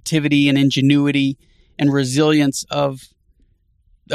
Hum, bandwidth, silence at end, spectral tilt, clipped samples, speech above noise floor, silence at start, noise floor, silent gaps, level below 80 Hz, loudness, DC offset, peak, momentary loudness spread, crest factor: none; 13.5 kHz; 0 s; -5.5 dB/octave; under 0.1%; 42 dB; 0.05 s; -58 dBFS; none; -56 dBFS; -17 LUFS; under 0.1%; -2 dBFS; 8 LU; 16 dB